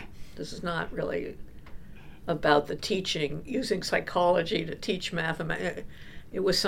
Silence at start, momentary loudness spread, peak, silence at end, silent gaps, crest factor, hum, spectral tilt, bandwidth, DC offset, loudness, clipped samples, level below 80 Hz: 0 s; 17 LU; -8 dBFS; 0 s; none; 22 dB; none; -4.5 dB/octave; 16.5 kHz; under 0.1%; -29 LUFS; under 0.1%; -50 dBFS